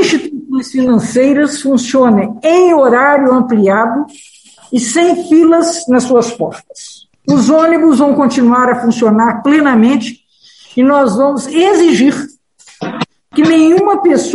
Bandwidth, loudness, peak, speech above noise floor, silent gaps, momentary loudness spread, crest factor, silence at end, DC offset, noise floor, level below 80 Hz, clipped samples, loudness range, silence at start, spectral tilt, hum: 11.5 kHz; -10 LUFS; 0 dBFS; 34 dB; none; 13 LU; 10 dB; 0 s; under 0.1%; -43 dBFS; -54 dBFS; under 0.1%; 3 LU; 0 s; -5 dB/octave; none